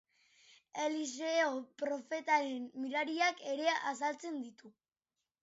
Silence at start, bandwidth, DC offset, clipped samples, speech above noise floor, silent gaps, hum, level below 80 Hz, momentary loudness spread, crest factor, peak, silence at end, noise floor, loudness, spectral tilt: 0.75 s; 7.6 kHz; under 0.1%; under 0.1%; over 54 dB; none; none; under -90 dBFS; 10 LU; 20 dB; -18 dBFS; 0.7 s; under -90 dBFS; -36 LUFS; 0.5 dB/octave